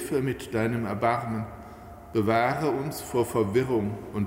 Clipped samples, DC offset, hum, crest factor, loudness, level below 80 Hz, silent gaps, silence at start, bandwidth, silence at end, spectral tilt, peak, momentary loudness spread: under 0.1%; under 0.1%; none; 18 dB; -27 LUFS; -52 dBFS; none; 0 s; 16 kHz; 0 s; -6.5 dB/octave; -10 dBFS; 11 LU